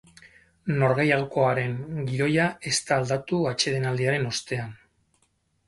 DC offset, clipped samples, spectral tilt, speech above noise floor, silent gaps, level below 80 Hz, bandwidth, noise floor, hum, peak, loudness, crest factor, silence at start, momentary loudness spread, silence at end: under 0.1%; under 0.1%; -5 dB/octave; 45 dB; none; -58 dBFS; 11.5 kHz; -69 dBFS; none; -6 dBFS; -25 LUFS; 20 dB; 0.65 s; 8 LU; 0.95 s